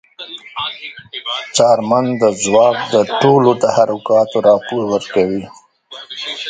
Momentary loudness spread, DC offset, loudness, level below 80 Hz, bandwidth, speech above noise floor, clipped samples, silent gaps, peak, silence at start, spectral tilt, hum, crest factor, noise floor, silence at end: 16 LU; under 0.1%; -14 LUFS; -56 dBFS; 9.6 kHz; 20 dB; under 0.1%; none; 0 dBFS; 0.2 s; -4.5 dB/octave; none; 14 dB; -35 dBFS; 0 s